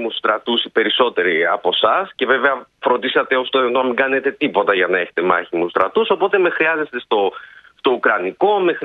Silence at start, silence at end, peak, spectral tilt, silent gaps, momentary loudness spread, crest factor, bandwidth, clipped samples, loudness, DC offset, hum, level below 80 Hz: 0 s; 0 s; 0 dBFS; -6.5 dB/octave; none; 4 LU; 16 dB; 4.7 kHz; under 0.1%; -17 LUFS; under 0.1%; none; -66 dBFS